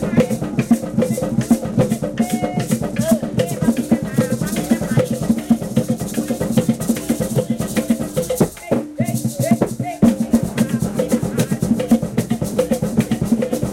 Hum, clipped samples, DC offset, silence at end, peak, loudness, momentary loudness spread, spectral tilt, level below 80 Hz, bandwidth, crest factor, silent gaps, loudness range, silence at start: none; under 0.1%; under 0.1%; 0 s; -4 dBFS; -19 LUFS; 4 LU; -6.5 dB/octave; -42 dBFS; 16.5 kHz; 16 dB; none; 2 LU; 0 s